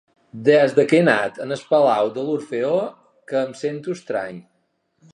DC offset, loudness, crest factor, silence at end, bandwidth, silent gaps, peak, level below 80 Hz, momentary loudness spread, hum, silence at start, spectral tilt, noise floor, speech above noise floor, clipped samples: under 0.1%; -20 LUFS; 18 dB; 0.7 s; 11 kHz; none; -2 dBFS; -72 dBFS; 12 LU; none; 0.35 s; -6 dB/octave; -68 dBFS; 49 dB; under 0.1%